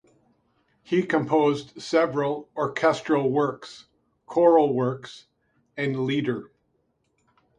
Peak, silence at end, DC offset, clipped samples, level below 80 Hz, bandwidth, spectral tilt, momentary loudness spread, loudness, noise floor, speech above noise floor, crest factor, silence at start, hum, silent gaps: -6 dBFS; 1.15 s; under 0.1%; under 0.1%; -68 dBFS; 10 kHz; -6.5 dB/octave; 15 LU; -24 LUFS; -71 dBFS; 48 dB; 20 dB; 0.9 s; none; none